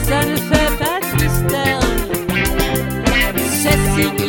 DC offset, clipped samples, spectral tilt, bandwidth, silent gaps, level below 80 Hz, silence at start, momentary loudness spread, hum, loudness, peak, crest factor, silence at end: under 0.1%; under 0.1%; -4.5 dB/octave; 17.5 kHz; none; -24 dBFS; 0 s; 4 LU; none; -16 LUFS; 0 dBFS; 16 dB; 0 s